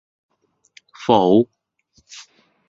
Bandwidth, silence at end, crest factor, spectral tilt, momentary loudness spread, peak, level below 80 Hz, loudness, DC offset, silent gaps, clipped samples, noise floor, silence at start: 7.8 kHz; 0.5 s; 20 dB; -6.5 dB/octave; 26 LU; -2 dBFS; -60 dBFS; -17 LUFS; under 0.1%; none; under 0.1%; -62 dBFS; 1 s